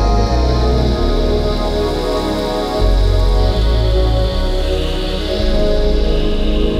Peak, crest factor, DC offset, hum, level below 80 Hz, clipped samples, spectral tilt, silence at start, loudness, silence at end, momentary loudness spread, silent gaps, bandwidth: -2 dBFS; 10 dB; under 0.1%; none; -16 dBFS; under 0.1%; -6.5 dB/octave; 0 s; -17 LUFS; 0 s; 3 LU; none; 12.5 kHz